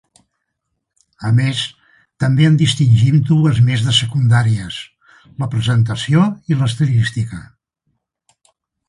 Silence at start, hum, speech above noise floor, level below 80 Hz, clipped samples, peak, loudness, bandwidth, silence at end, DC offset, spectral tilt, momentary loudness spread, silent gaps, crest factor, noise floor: 1.2 s; none; 60 dB; -46 dBFS; under 0.1%; -2 dBFS; -15 LUFS; 11.5 kHz; 1.45 s; under 0.1%; -6 dB/octave; 14 LU; none; 14 dB; -74 dBFS